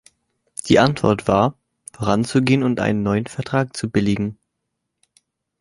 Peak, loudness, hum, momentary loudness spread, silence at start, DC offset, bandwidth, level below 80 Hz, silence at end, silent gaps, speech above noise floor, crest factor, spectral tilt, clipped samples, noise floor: 0 dBFS; -19 LUFS; none; 9 LU; 0.65 s; under 0.1%; 11.5 kHz; -48 dBFS; 1.25 s; none; 59 dB; 20 dB; -6 dB/octave; under 0.1%; -77 dBFS